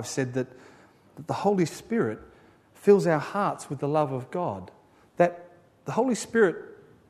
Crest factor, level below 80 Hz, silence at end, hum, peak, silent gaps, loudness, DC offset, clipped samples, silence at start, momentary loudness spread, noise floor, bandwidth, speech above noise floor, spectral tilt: 20 dB; -68 dBFS; 0.35 s; none; -6 dBFS; none; -26 LUFS; under 0.1%; under 0.1%; 0 s; 18 LU; -56 dBFS; 13.5 kHz; 30 dB; -6 dB/octave